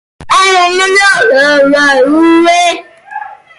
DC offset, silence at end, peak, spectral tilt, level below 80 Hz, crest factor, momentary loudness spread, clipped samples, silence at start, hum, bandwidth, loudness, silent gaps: under 0.1%; 0.25 s; 0 dBFS; -2 dB/octave; -48 dBFS; 8 dB; 18 LU; under 0.1%; 0.2 s; none; 11.5 kHz; -7 LUFS; none